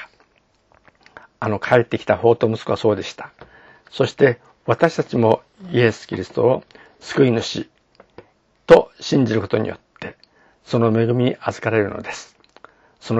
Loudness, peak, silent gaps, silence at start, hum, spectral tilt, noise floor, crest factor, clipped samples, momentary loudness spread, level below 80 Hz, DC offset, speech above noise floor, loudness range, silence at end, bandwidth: -19 LUFS; 0 dBFS; none; 0 s; none; -6.5 dB/octave; -60 dBFS; 20 dB; under 0.1%; 18 LU; -54 dBFS; under 0.1%; 41 dB; 3 LU; 0 s; 8.2 kHz